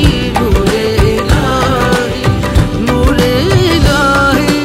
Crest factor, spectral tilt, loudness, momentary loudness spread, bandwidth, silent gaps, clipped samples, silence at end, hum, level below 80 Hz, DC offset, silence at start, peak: 10 dB; -5.5 dB/octave; -11 LUFS; 4 LU; 16.5 kHz; none; under 0.1%; 0 s; none; -18 dBFS; under 0.1%; 0 s; 0 dBFS